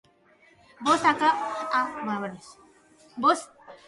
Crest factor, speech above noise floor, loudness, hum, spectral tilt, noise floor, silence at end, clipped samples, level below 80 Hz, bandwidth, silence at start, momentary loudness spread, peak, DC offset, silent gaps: 20 dB; 34 dB; -25 LUFS; none; -3.5 dB/octave; -59 dBFS; 0.15 s; under 0.1%; -70 dBFS; 11.5 kHz; 0.8 s; 19 LU; -8 dBFS; under 0.1%; none